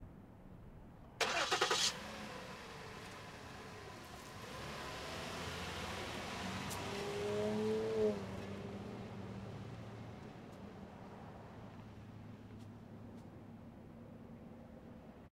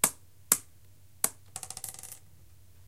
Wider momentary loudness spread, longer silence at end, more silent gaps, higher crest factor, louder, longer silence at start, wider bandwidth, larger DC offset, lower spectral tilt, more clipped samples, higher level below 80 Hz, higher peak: about the same, 19 LU vs 19 LU; second, 0 s vs 0.7 s; neither; second, 24 dB vs 34 dB; second, -42 LUFS vs -31 LUFS; about the same, 0 s vs 0.05 s; about the same, 16 kHz vs 16.5 kHz; second, under 0.1% vs 0.2%; first, -3.5 dB/octave vs -0.5 dB/octave; neither; about the same, -64 dBFS vs -66 dBFS; second, -20 dBFS vs -2 dBFS